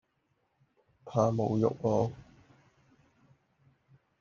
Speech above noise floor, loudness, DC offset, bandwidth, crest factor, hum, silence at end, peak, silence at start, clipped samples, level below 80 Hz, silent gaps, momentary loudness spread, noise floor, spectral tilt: 48 dB; -30 LUFS; under 0.1%; 7.2 kHz; 22 dB; none; 2 s; -12 dBFS; 1.05 s; under 0.1%; -66 dBFS; none; 7 LU; -76 dBFS; -8.5 dB/octave